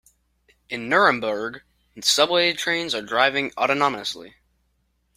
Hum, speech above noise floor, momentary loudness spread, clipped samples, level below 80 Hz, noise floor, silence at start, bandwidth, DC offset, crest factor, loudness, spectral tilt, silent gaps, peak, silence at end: none; 47 dB; 14 LU; under 0.1%; -64 dBFS; -69 dBFS; 0.7 s; 16 kHz; under 0.1%; 22 dB; -21 LUFS; -2 dB/octave; none; -2 dBFS; 0.85 s